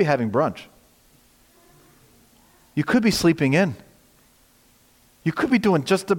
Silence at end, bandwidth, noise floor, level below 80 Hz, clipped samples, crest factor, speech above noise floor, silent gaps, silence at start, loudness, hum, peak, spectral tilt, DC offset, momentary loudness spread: 0 s; 17 kHz; -57 dBFS; -54 dBFS; under 0.1%; 18 dB; 37 dB; none; 0 s; -21 LUFS; none; -6 dBFS; -6 dB/octave; under 0.1%; 11 LU